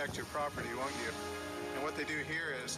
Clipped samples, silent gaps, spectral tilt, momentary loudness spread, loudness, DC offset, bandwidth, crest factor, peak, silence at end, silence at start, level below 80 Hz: under 0.1%; none; -3.5 dB/octave; 5 LU; -38 LUFS; under 0.1%; 15.5 kHz; 10 dB; -28 dBFS; 0 s; 0 s; -64 dBFS